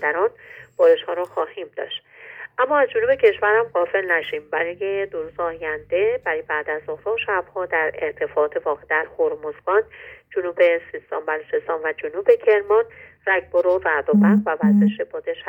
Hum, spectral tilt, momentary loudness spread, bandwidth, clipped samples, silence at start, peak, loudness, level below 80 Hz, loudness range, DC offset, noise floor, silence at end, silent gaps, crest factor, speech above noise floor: none; -8 dB/octave; 12 LU; 3.7 kHz; under 0.1%; 0 s; -4 dBFS; -21 LUFS; -62 dBFS; 5 LU; under 0.1%; -40 dBFS; 0 s; none; 18 dB; 19 dB